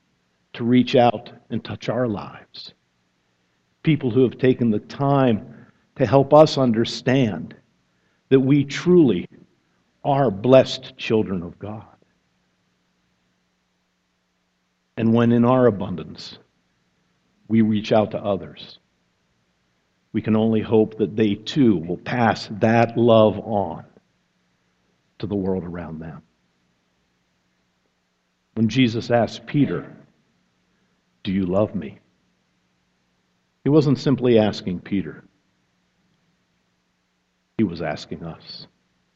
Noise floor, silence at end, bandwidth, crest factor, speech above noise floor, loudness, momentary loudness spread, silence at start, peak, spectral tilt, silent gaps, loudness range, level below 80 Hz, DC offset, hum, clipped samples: -70 dBFS; 0.5 s; 7.8 kHz; 22 dB; 50 dB; -20 LUFS; 20 LU; 0.55 s; 0 dBFS; -7.5 dB/octave; none; 13 LU; -56 dBFS; under 0.1%; none; under 0.1%